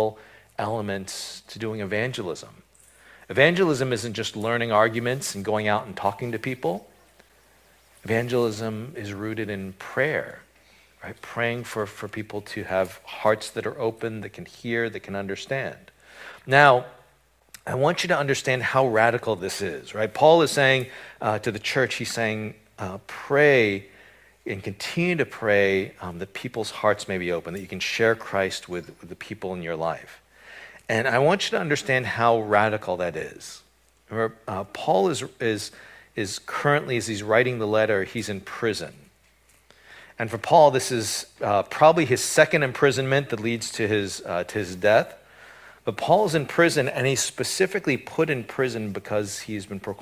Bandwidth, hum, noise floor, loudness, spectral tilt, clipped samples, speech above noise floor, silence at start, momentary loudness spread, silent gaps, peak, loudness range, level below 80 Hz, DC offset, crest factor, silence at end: 16 kHz; none; -61 dBFS; -24 LUFS; -4.5 dB/octave; under 0.1%; 37 dB; 0 s; 16 LU; none; 0 dBFS; 7 LU; -58 dBFS; under 0.1%; 24 dB; 0 s